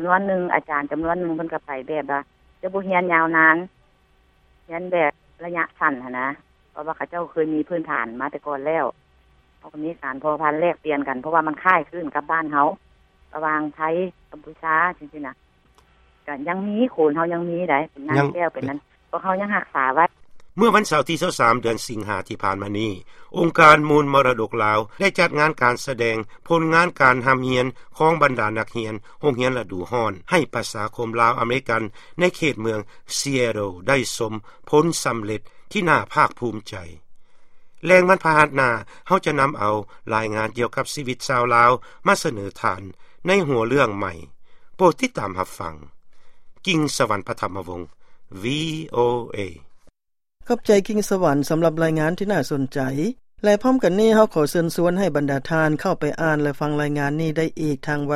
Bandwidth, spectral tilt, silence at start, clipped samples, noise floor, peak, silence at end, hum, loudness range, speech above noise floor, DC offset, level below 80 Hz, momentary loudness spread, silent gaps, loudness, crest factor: 15.5 kHz; -5 dB/octave; 0 s; under 0.1%; -81 dBFS; 0 dBFS; 0 s; none; 7 LU; 60 dB; under 0.1%; -52 dBFS; 13 LU; none; -21 LUFS; 22 dB